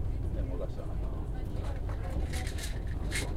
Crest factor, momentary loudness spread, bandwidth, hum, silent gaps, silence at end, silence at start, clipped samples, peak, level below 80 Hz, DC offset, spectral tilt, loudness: 14 dB; 3 LU; 15 kHz; none; none; 0 s; 0 s; under 0.1%; -20 dBFS; -36 dBFS; under 0.1%; -5.5 dB/octave; -37 LUFS